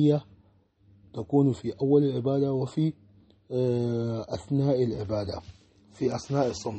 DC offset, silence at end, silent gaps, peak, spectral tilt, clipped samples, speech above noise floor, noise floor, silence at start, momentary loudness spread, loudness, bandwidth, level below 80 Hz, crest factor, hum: under 0.1%; 0 s; none; -10 dBFS; -8 dB/octave; under 0.1%; 36 dB; -62 dBFS; 0 s; 10 LU; -27 LUFS; 8.4 kHz; -58 dBFS; 18 dB; none